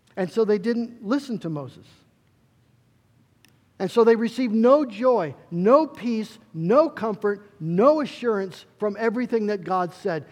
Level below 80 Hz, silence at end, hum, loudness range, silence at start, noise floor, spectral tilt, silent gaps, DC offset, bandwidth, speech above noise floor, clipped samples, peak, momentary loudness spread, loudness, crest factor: -74 dBFS; 0.05 s; none; 7 LU; 0.15 s; -62 dBFS; -7.5 dB/octave; none; under 0.1%; 12 kHz; 39 dB; under 0.1%; -4 dBFS; 12 LU; -23 LUFS; 20 dB